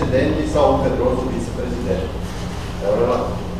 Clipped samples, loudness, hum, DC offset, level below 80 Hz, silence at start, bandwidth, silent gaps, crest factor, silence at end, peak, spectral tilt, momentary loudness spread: under 0.1%; -20 LUFS; none; 1%; -30 dBFS; 0 s; 15 kHz; none; 18 dB; 0 s; 0 dBFS; -7 dB/octave; 11 LU